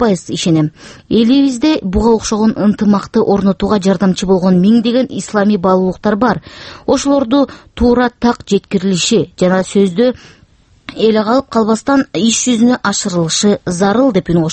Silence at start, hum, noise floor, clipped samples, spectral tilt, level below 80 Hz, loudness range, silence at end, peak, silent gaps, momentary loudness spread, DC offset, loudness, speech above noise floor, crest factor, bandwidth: 0 s; none; -48 dBFS; under 0.1%; -5 dB/octave; -36 dBFS; 2 LU; 0 s; 0 dBFS; none; 5 LU; under 0.1%; -13 LUFS; 36 dB; 12 dB; 8.8 kHz